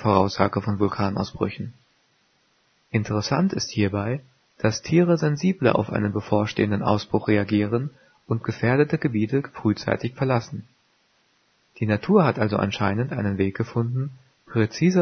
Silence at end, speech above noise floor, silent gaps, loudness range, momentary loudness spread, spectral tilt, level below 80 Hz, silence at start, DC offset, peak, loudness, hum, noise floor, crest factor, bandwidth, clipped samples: 0 s; 43 dB; none; 4 LU; 9 LU; -7 dB/octave; -56 dBFS; 0 s; under 0.1%; -2 dBFS; -23 LUFS; none; -65 dBFS; 22 dB; 6.6 kHz; under 0.1%